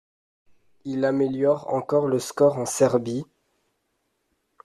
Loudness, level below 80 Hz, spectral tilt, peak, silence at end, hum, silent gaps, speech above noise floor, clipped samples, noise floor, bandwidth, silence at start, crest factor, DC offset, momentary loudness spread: -23 LUFS; -66 dBFS; -5.5 dB/octave; -6 dBFS; 1.4 s; none; none; 52 dB; under 0.1%; -74 dBFS; 13.5 kHz; 0.85 s; 20 dB; under 0.1%; 11 LU